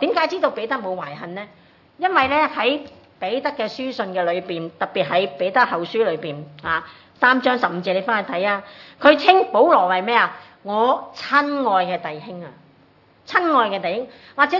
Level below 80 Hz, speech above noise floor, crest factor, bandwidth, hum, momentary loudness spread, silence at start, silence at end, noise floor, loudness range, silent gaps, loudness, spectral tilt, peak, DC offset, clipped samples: -66 dBFS; 34 dB; 20 dB; 6 kHz; none; 15 LU; 0 s; 0 s; -54 dBFS; 5 LU; none; -20 LUFS; -5.5 dB/octave; 0 dBFS; under 0.1%; under 0.1%